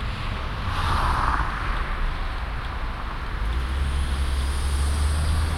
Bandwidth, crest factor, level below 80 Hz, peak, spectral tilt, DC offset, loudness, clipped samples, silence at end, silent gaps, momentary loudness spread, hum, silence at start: 13 kHz; 18 dB; -26 dBFS; -6 dBFS; -5 dB/octave; under 0.1%; -27 LUFS; under 0.1%; 0 s; none; 8 LU; none; 0 s